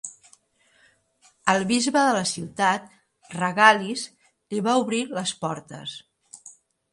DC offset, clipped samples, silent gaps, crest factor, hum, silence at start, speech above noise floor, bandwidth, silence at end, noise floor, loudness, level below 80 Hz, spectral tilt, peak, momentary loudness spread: under 0.1%; under 0.1%; none; 26 dB; none; 0.05 s; 40 dB; 11.5 kHz; 0.4 s; -62 dBFS; -23 LUFS; -68 dBFS; -3.5 dB/octave; 0 dBFS; 21 LU